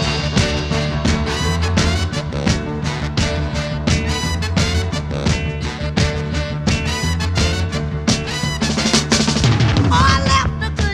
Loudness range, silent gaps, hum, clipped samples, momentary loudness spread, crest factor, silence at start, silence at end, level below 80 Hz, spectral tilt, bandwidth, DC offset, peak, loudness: 4 LU; none; none; under 0.1%; 7 LU; 16 dB; 0 s; 0 s; -26 dBFS; -4.5 dB/octave; 13.5 kHz; under 0.1%; 0 dBFS; -18 LUFS